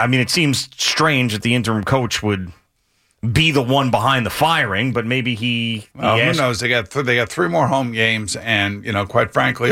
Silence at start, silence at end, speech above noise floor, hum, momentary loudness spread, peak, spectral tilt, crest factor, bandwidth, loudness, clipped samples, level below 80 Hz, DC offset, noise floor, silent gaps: 0 s; 0 s; 46 dB; none; 6 LU; -4 dBFS; -4.5 dB/octave; 14 dB; 16.5 kHz; -17 LUFS; under 0.1%; -46 dBFS; under 0.1%; -64 dBFS; none